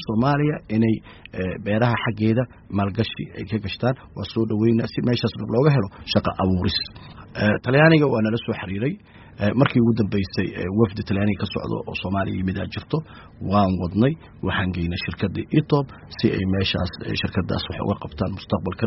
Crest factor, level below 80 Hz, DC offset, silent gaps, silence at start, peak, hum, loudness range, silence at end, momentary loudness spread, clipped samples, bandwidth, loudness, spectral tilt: 20 dB; -46 dBFS; under 0.1%; none; 0 s; -2 dBFS; none; 4 LU; 0 s; 9 LU; under 0.1%; 6 kHz; -23 LUFS; -5.5 dB/octave